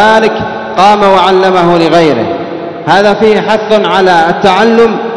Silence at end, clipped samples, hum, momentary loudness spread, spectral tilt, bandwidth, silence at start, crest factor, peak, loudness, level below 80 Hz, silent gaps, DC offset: 0 s; 6%; none; 9 LU; -5.5 dB/octave; 11 kHz; 0 s; 8 dB; 0 dBFS; -7 LUFS; -42 dBFS; none; 1%